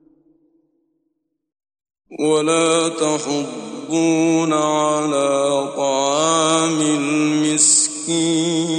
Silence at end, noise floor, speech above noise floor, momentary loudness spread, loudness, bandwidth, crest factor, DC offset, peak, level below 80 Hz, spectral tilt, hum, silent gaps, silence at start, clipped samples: 0 s; -72 dBFS; 55 dB; 8 LU; -17 LUFS; 11 kHz; 18 dB; under 0.1%; -2 dBFS; -68 dBFS; -3 dB/octave; none; none; 2.1 s; under 0.1%